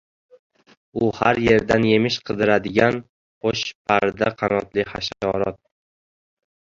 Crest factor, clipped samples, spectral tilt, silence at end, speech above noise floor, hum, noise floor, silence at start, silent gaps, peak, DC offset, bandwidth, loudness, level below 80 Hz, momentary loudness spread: 20 dB; under 0.1%; -5.5 dB/octave; 1.1 s; over 70 dB; none; under -90 dBFS; 0.95 s; 3.09-3.41 s, 3.75-3.85 s; -2 dBFS; under 0.1%; 7.6 kHz; -21 LUFS; -50 dBFS; 9 LU